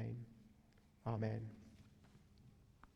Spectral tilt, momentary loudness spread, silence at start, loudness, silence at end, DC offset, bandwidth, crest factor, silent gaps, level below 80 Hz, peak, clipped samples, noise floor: -9 dB/octave; 24 LU; 0 s; -46 LUFS; 0.1 s; under 0.1%; 7.2 kHz; 20 dB; none; -72 dBFS; -28 dBFS; under 0.1%; -69 dBFS